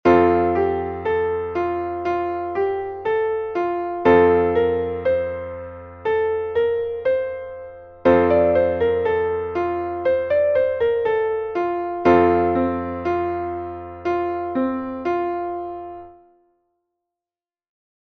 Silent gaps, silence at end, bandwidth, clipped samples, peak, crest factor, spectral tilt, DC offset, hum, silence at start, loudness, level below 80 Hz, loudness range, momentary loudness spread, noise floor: none; 2.05 s; 6.2 kHz; under 0.1%; -2 dBFS; 18 dB; -8.5 dB/octave; under 0.1%; none; 0.05 s; -21 LUFS; -48 dBFS; 7 LU; 13 LU; under -90 dBFS